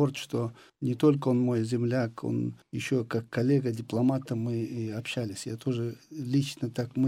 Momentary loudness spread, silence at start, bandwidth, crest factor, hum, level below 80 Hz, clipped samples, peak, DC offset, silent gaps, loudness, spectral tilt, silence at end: 9 LU; 0 s; 15 kHz; 16 dB; none; -70 dBFS; under 0.1%; -12 dBFS; under 0.1%; none; -30 LUFS; -7 dB/octave; 0 s